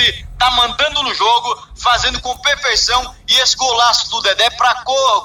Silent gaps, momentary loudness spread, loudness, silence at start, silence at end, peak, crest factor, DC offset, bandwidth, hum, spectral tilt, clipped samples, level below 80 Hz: none; 5 LU; -13 LUFS; 0 s; 0 s; 0 dBFS; 14 dB; under 0.1%; 17 kHz; none; 0 dB/octave; under 0.1%; -36 dBFS